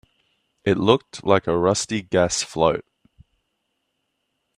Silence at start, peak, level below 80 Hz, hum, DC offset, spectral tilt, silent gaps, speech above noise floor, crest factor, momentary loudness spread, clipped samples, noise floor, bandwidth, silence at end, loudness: 0.65 s; 0 dBFS; -54 dBFS; none; under 0.1%; -4.5 dB/octave; none; 55 dB; 22 dB; 5 LU; under 0.1%; -75 dBFS; 13 kHz; 1.75 s; -21 LUFS